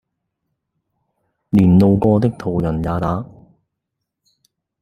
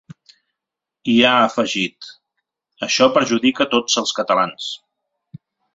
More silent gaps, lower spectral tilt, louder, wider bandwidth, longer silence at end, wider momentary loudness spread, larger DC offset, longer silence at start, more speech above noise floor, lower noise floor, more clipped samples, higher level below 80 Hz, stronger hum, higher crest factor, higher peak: neither; first, -10 dB/octave vs -3 dB/octave; about the same, -16 LUFS vs -17 LUFS; first, 9.8 kHz vs 8 kHz; first, 1.55 s vs 1 s; second, 11 LU vs 15 LU; neither; first, 1.55 s vs 0.1 s; second, 62 dB vs 67 dB; second, -79 dBFS vs -84 dBFS; neither; first, -42 dBFS vs -62 dBFS; neither; about the same, 18 dB vs 18 dB; about the same, -2 dBFS vs -2 dBFS